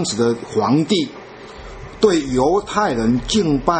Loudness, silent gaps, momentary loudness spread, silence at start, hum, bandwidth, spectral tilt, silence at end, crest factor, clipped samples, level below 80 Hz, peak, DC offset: -18 LUFS; none; 19 LU; 0 s; none; 8.8 kHz; -5 dB/octave; 0 s; 18 dB; under 0.1%; -38 dBFS; 0 dBFS; under 0.1%